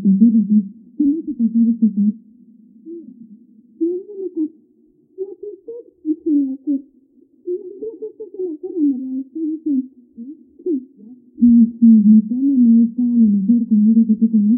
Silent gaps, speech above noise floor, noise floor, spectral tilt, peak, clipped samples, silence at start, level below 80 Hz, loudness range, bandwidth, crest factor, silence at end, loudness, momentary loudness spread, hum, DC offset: none; 41 dB; -55 dBFS; -18.5 dB/octave; -2 dBFS; under 0.1%; 0 s; -62 dBFS; 14 LU; 0.8 kHz; 14 dB; 0 s; -16 LUFS; 22 LU; none; under 0.1%